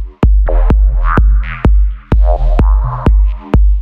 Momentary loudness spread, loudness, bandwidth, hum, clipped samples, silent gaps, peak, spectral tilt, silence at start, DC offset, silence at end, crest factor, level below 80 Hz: 2 LU; -13 LUFS; 3.5 kHz; none; under 0.1%; none; 0 dBFS; -9.5 dB/octave; 0 s; under 0.1%; 0 s; 8 dB; -10 dBFS